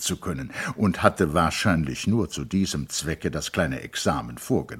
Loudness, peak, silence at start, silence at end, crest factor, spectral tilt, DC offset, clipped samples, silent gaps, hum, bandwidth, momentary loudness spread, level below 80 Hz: -25 LUFS; -2 dBFS; 0 s; 0 s; 24 dB; -5 dB/octave; under 0.1%; under 0.1%; none; none; 16.5 kHz; 8 LU; -44 dBFS